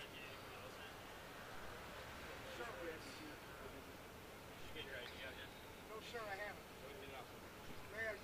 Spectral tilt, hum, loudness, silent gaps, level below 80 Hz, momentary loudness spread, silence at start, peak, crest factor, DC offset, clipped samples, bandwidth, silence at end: -3.5 dB/octave; none; -52 LUFS; none; -66 dBFS; 7 LU; 0 s; -34 dBFS; 18 dB; under 0.1%; under 0.1%; 15.5 kHz; 0 s